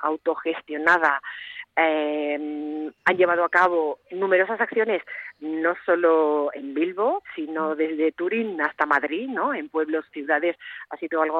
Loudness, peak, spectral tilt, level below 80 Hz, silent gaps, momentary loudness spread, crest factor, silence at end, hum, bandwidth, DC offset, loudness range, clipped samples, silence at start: -23 LUFS; -6 dBFS; -5.5 dB/octave; -74 dBFS; none; 11 LU; 18 dB; 0 s; none; 8 kHz; under 0.1%; 3 LU; under 0.1%; 0 s